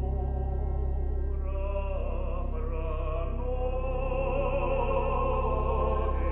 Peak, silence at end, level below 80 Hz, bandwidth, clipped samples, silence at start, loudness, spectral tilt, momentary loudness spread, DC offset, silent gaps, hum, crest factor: -16 dBFS; 0 s; -30 dBFS; 3.5 kHz; under 0.1%; 0 s; -31 LUFS; -10.5 dB/octave; 5 LU; under 0.1%; none; none; 12 dB